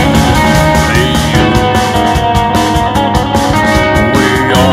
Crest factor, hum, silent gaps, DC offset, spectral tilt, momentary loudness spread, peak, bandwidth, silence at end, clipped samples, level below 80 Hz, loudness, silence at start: 8 dB; none; none; under 0.1%; -5 dB/octave; 3 LU; 0 dBFS; 16.5 kHz; 0 s; 1%; -20 dBFS; -9 LUFS; 0 s